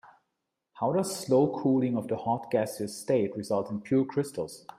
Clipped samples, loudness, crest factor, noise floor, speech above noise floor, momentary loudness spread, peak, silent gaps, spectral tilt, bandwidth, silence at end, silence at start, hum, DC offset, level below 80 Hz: under 0.1%; -29 LUFS; 16 dB; -83 dBFS; 55 dB; 8 LU; -12 dBFS; none; -6.5 dB/octave; 15.5 kHz; 0.2 s; 0.05 s; none; under 0.1%; -70 dBFS